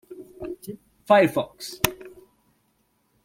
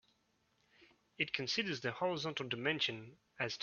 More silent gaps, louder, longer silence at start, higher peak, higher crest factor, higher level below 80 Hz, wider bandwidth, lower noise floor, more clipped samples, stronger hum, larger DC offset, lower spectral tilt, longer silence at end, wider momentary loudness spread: neither; first, -23 LUFS vs -38 LUFS; second, 0.1 s vs 0.8 s; first, 0 dBFS vs -18 dBFS; about the same, 26 dB vs 24 dB; first, -54 dBFS vs -78 dBFS; first, 16.5 kHz vs 7 kHz; second, -69 dBFS vs -77 dBFS; neither; neither; neither; first, -4 dB/octave vs -2 dB/octave; first, 1.15 s vs 0 s; first, 25 LU vs 7 LU